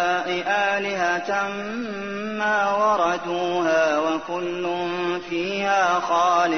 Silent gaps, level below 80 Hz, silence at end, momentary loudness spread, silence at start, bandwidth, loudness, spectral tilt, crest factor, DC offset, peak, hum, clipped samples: none; -64 dBFS; 0 s; 8 LU; 0 s; 6.6 kHz; -22 LUFS; -4 dB/octave; 14 dB; 0.2%; -8 dBFS; none; under 0.1%